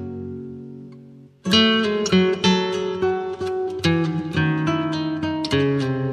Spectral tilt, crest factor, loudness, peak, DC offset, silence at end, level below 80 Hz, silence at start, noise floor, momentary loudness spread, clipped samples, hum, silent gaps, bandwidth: -5.5 dB/octave; 18 dB; -20 LUFS; -4 dBFS; under 0.1%; 0 s; -54 dBFS; 0 s; -45 dBFS; 16 LU; under 0.1%; none; none; 13 kHz